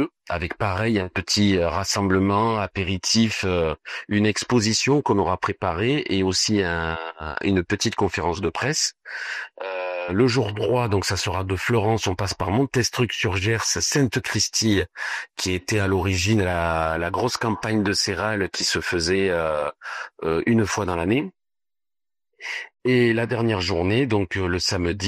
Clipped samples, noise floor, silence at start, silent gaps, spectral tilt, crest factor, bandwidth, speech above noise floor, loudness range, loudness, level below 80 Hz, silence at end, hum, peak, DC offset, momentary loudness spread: under 0.1%; under -90 dBFS; 0 s; none; -4.5 dB/octave; 18 dB; 14.5 kHz; over 68 dB; 3 LU; -22 LUFS; -46 dBFS; 0 s; none; -4 dBFS; under 0.1%; 8 LU